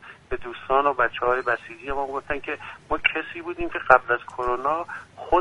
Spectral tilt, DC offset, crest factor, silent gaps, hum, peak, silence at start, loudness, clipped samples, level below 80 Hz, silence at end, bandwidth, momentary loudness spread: -5.5 dB/octave; under 0.1%; 24 dB; none; none; 0 dBFS; 0 s; -24 LUFS; under 0.1%; -44 dBFS; 0 s; 11 kHz; 15 LU